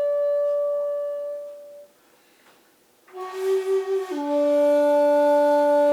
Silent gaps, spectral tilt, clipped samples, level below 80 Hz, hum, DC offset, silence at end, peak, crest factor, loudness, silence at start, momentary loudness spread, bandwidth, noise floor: none; -3 dB/octave; under 0.1%; -86 dBFS; none; under 0.1%; 0 s; -10 dBFS; 12 dB; -21 LUFS; 0 s; 16 LU; 14 kHz; -59 dBFS